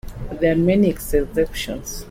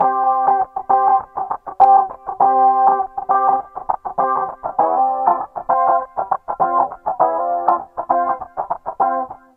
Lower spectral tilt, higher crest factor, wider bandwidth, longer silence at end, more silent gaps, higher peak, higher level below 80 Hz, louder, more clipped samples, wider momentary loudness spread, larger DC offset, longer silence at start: second, -6 dB/octave vs -8.5 dB/octave; about the same, 14 dB vs 16 dB; first, 16.5 kHz vs 2.8 kHz; second, 0 s vs 0.2 s; neither; second, -6 dBFS vs 0 dBFS; first, -32 dBFS vs -56 dBFS; second, -20 LUFS vs -17 LUFS; neither; about the same, 12 LU vs 11 LU; neither; about the same, 0.05 s vs 0 s